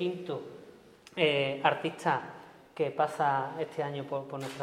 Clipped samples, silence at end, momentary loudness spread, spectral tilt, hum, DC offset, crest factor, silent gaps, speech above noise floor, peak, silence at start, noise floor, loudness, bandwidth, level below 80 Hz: under 0.1%; 0 s; 19 LU; -5.5 dB/octave; none; under 0.1%; 22 dB; none; 23 dB; -10 dBFS; 0 s; -55 dBFS; -31 LUFS; 15.5 kHz; -76 dBFS